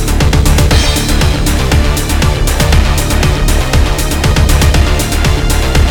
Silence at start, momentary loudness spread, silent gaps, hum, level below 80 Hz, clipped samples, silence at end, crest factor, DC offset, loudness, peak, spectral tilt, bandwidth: 0 s; 3 LU; none; none; -12 dBFS; under 0.1%; 0 s; 8 dB; under 0.1%; -11 LUFS; 0 dBFS; -4.5 dB/octave; 19 kHz